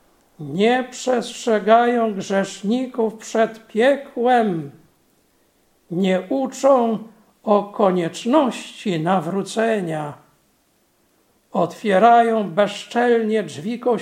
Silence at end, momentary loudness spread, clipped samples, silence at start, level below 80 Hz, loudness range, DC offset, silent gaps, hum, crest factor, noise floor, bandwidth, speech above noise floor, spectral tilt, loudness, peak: 0 s; 12 LU; under 0.1%; 0.4 s; -70 dBFS; 4 LU; under 0.1%; none; none; 20 dB; -62 dBFS; 15 kHz; 43 dB; -5.5 dB/octave; -19 LUFS; 0 dBFS